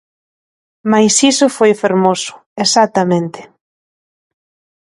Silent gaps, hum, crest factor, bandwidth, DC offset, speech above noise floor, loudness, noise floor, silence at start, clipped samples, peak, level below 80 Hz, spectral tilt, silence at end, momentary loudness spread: 2.46-2.56 s; none; 16 dB; 11.5 kHz; under 0.1%; over 78 dB; -12 LUFS; under -90 dBFS; 0.85 s; under 0.1%; 0 dBFS; -62 dBFS; -3.5 dB/octave; 1.5 s; 12 LU